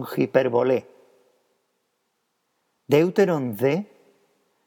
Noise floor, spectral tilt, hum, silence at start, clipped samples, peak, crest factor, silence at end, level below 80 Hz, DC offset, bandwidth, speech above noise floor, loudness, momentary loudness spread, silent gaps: -74 dBFS; -7 dB/octave; none; 0 s; under 0.1%; -2 dBFS; 22 dB; 0.8 s; -82 dBFS; under 0.1%; 18.5 kHz; 53 dB; -22 LUFS; 7 LU; none